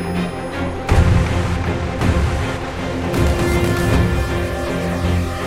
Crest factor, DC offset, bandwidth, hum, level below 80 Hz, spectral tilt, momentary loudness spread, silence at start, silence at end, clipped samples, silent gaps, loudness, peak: 16 dB; under 0.1%; 16 kHz; none; -24 dBFS; -6.5 dB/octave; 7 LU; 0 s; 0 s; under 0.1%; none; -19 LUFS; -2 dBFS